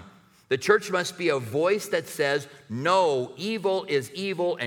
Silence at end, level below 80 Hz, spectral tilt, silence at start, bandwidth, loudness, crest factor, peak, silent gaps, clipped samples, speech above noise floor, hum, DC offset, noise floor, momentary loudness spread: 0 s; -74 dBFS; -4.5 dB/octave; 0 s; 18.5 kHz; -26 LUFS; 20 dB; -6 dBFS; none; under 0.1%; 27 dB; none; under 0.1%; -52 dBFS; 8 LU